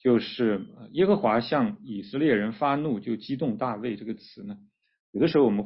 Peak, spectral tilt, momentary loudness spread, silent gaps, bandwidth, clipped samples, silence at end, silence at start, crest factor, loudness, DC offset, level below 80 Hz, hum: -10 dBFS; -11 dB/octave; 16 LU; 5.00-5.13 s; 5.8 kHz; under 0.1%; 0 s; 0.05 s; 16 dB; -26 LUFS; under 0.1%; -64 dBFS; none